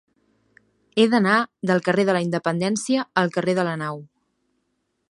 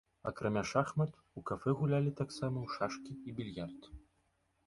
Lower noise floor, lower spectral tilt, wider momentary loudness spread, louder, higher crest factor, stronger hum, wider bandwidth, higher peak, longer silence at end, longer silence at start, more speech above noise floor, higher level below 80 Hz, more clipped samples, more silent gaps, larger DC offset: second, -73 dBFS vs -77 dBFS; second, -5.5 dB/octave vs -7 dB/octave; second, 9 LU vs 12 LU; first, -21 LUFS vs -37 LUFS; about the same, 20 dB vs 22 dB; neither; about the same, 11.5 kHz vs 11.5 kHz; first, -2 dBFS vs -16 dBFS; first, 1.05 s vs 0.65 s; first, 0.95 s vs 0.25 s; first, 52 dB vs 40 dB; second, -70 dBFS vs -62 dBFS; neither; neither; neither